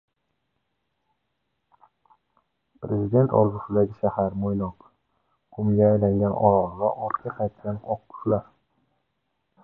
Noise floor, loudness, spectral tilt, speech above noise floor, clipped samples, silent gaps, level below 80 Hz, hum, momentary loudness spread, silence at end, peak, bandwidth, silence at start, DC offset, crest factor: -77 dBFS; -24 LUFS; -13.5 dB/octave; 54 dB; under 0.1%; none; -52 dBFS; none; 11 LU; 1.2 s; -4 dBFS; 2.5 kHz; 2.8 s; under 0.1%; 22 dB